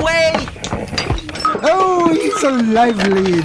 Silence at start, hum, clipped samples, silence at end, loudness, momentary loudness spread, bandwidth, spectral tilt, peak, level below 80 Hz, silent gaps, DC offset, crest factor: 0 s; none; under 0.1%; 0 s; -15 LUFS; 8 LU; 11 kHz; -5 dB/octave; -2 dBFS; -34 dBFS; none; under 0.1%; 14 dB